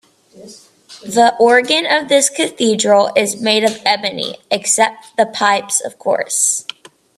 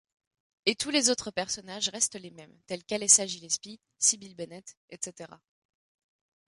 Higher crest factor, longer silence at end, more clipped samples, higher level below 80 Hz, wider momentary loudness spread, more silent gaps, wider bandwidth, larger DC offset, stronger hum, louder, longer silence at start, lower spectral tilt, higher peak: second, 16 dB vs 26 dB; second, 0.55 s vs 1.1 s; neither; first, -64 dBFS vs -72 dBFS; second, 8 LU vs 24 LU; second, none vs 4.77-4.88 s; first, 15 kHz vs 12 kHz; neither; neither; first, -14 LUFS vs -27 LUFS; second, 0.35 s vs 0.65 s; about the same, -1.5 dB/octave vs -0.5 dB/octave; first, 0 dBFS vs -6 dBFS